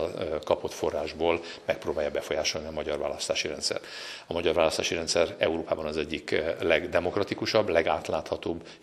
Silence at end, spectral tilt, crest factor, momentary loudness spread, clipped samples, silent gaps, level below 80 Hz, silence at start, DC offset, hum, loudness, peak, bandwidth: 0.05 s; -3.5 dB/octave; 22 dB; 8 LU; under 0.1%; none; -54 dBFS; 0 s; under 0.1%; none; -28 LUFS; -6 dBFS; 14 kHz